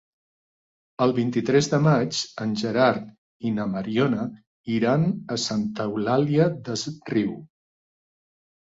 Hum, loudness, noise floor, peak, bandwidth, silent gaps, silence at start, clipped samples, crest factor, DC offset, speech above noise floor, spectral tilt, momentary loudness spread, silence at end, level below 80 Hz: none; -24 LUFS; under -90 dBFS; -6 dBFS; 7.8 kHz; 3.18-3.40 s, 4.47-4.64 s; 1 s; under 0.1%; 18 dB; under 0.1%; over 67 dB; -6 dB/octave; 10 LU; 1.3 s; -62 dBFS